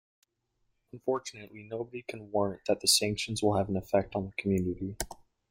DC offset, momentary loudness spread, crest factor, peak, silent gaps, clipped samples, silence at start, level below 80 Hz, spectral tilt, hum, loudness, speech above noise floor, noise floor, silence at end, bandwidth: under 0.1%; 15 LU; 22 dB; -10 dBFS; none; under 0.1%; 0.95 s; -56 dBFS; -3.5 dB/octave; none; -31 LUFS; 46 dB; -77 dBFS; 0.35 s; 16.5 kHz